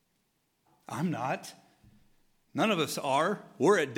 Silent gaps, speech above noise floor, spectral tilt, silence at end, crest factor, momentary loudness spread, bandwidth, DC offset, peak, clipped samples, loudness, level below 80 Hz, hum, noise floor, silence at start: none; 46 dB; -4.5 dB/octave; 0 s; 20 dB; 13 LU; 17 kHz; under 0.1%; -12 dBFS; under 0.1%; -30 LUFS; -76 dBFS; none; -75 dBFS; 0.9 s